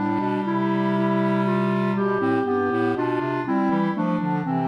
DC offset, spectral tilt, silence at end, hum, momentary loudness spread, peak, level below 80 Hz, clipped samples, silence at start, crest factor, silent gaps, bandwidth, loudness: under 0.1%; -9 dB/octave; 0 s; none; 2 LU; -10 dBFS; -66 dBFS; under 0.1%; 0 s; 12 dB; none; 6 kHz; -23 LUFS